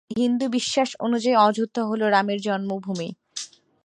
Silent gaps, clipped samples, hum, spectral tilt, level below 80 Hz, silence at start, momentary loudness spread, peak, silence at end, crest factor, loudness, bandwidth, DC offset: none; under 0.1%; none; -4.5 dB/octave; -70 dBFS; 0.1 s; 15 LU; -6 dBFS; 0.4 s; 18 dB; -23 LUFS; 10.5 kHz; under 0.1%